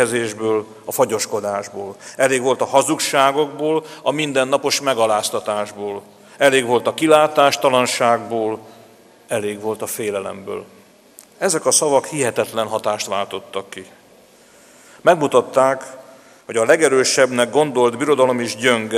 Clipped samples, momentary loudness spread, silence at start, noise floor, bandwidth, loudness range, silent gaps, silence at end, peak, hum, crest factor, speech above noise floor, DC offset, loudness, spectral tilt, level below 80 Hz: under 0.1%; 13 LU; 0 s; -49 dBFS; 15.5 kHz; 5 LU; none; 0 s; 0 dBFS; none; 18 dB; 31 dB; under 0.1%; -18 LUFS; -3 dB/octave; -68 dBFS